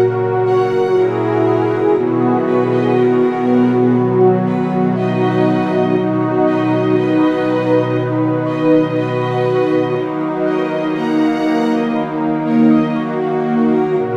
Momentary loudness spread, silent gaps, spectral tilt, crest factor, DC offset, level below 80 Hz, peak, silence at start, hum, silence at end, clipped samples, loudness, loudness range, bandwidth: 5 LU; none; -8.5 dB/octave; 12 dB; under 0.1%; -62 dBFS; -2 dBFS; 0 s; none; 0 s; under 0.1%; -15 LUFS; 2 LU; 7.8 kHz